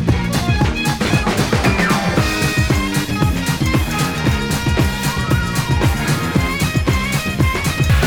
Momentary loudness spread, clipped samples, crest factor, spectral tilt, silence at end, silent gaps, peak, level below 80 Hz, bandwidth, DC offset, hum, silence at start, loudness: 3 LU; under 0.1%; 14 dB; -5 dB/octave; 0 s; none; -4 dBFS; -24 dBFS; over 20 kHz; under 0.1%; none; 0 s; -17 LUFS